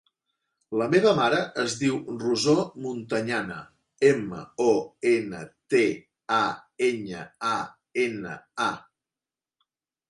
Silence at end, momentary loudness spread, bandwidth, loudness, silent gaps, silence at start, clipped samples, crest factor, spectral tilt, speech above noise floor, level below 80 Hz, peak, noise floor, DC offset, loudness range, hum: 1.3 s; 14 LU; 11.5 kHz; -26 LUFS; none; 0.7 s; under 0.1%; 20 dB; -4.5 dB/octave; over 65 dB; -66 dBFS; -8 dBFS; under -90 dBFS; under 0.1%; 4 LU; none